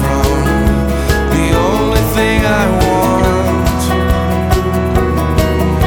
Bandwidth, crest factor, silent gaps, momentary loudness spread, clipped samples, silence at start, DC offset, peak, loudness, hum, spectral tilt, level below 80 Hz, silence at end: 19.5 kHz; 12 dB; none; 2 LU; under 0.1%; 0 s; under 0.1%; 0 dBFS; -13 LUFS; none; -6 dB/octave; -18 dBFS; 0 s